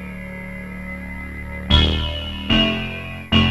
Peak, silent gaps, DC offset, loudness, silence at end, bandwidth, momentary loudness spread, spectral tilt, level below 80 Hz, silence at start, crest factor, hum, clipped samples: 0 dBFS; none; 0.4%; -20 LUFS; 0 s; 12 kHz; 15 LU; -6 dB/octave; -28 dBFS; 0 s; 20 dB; none; under 0.1%